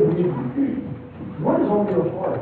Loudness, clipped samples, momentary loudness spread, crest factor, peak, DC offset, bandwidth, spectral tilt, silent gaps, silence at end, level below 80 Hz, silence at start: -22 LUFS; under 0.1%; 15 LU; 14 dB; -8 dBFS; under 0.1%; 4.4 kHz; -12 dB/octave; none; 0 s; -50 dBFS; 0 s